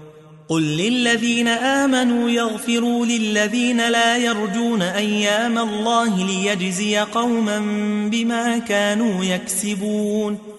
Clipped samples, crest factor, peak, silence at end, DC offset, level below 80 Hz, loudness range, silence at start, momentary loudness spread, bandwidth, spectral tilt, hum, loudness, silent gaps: under 0.1%; 14 dB; -6 dBFS; 0 s; under 0.1%; -62 dBFS; 2 LU; 0 s; 4 LU; 12 kHz; -4 dB/octave; none; -19 LUFS; none